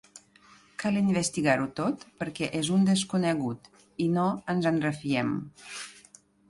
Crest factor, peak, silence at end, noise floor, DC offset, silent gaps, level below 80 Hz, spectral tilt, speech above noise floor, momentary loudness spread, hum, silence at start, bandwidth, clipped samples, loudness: 18 dB; -10 dBFS; 0.5 s; -58 dBFS; under 0.1%; none; -64 dBFS; -5.5 dB/octave; 30 dB; 15 LU; none; 0.15 s; 11.5 kHz; under 0.1%; -28 LUFS